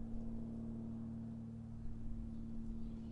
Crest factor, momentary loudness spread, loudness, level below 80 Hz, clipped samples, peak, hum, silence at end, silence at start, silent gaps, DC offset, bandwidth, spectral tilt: 12 dB; 3 LU; -48 LUFS; -50 dBFS; under 0.1%; -34 dBFS; none; 0 s; 0 s; none; under 0.1%; 5.4 kHz; -10 dB/octave